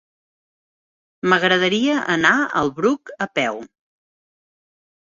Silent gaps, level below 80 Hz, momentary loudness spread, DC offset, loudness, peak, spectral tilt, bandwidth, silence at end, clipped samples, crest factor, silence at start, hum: none; -60 dBFS; 9 LU; under 0.1%; -18 LUFS; -2 dBFS; -4.5 dB/octave; 7.8 kHz; 1.35 s; under 0.1%; 20 dB; 1.25 s; none